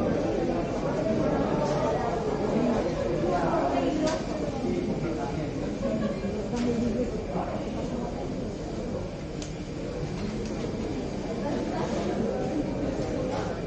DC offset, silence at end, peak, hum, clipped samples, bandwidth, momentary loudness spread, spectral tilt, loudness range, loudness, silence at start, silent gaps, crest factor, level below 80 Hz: under 0.1%; 0 s; -14 dBFS; none; under 0.1%; 9 kHz; 7 LU; -6.5 dB/octave; 6 LU; -29 LUFS; 0 s; none; 16 dB; -42 dBFS